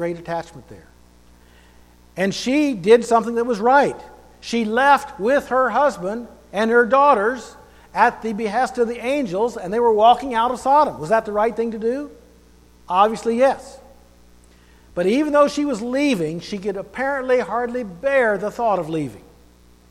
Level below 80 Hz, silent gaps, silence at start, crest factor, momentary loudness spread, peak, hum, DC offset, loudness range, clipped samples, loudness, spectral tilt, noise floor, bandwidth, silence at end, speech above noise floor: -52 dBFS; none; 0 s; 18 dB; 13 LU; -2 dBFS; 60 Hz at -50 dBFS; under 0.1%; 4 LU; under 0.1%; -19 LUFS; -5 dB/octave; -50 dBFS; 14 kHz; 0.7 s; 31 dB